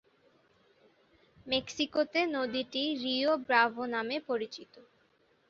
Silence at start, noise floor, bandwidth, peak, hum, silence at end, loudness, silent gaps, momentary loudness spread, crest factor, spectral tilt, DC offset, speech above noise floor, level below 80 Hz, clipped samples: 1.45 s; -69 dBFS; 7.6 kHz; -10 dBFS; none; 0.7 s; -31 LUFS; none; 9 LU; 22 dB; 0 dB/octave; under 0.1%; 38 dB; -72 dBFS; under 0.1%